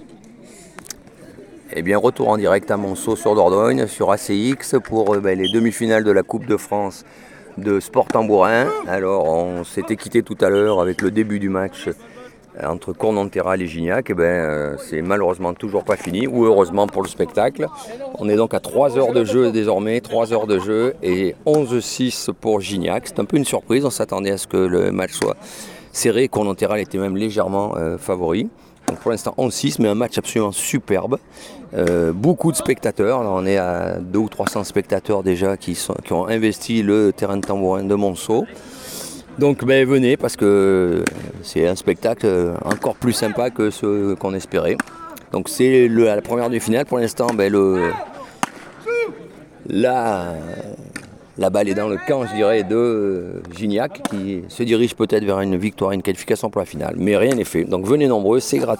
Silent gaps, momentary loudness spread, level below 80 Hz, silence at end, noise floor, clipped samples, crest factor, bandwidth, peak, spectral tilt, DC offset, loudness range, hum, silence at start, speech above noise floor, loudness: none; 11 LU; -50 dBFS; 0 s; -42 dBFS; under 0.1%; 18 dB; 19 kHz; 0 dBFS; -5.5 dB/octave; under 0.1%; 3 LU; none; 0 s; 24 dB; -19 LUFS